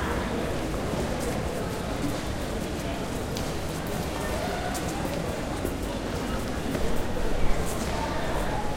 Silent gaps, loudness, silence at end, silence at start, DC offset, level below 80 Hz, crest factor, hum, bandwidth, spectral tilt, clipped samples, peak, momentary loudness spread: none; -30 LUFS; 0 s; 0 s; under 0.1%; -34 dBFS; 18 dB; none; 16.5 kHz; -5 dB/octave; under 0.1%; -10 dBFS; 2 LU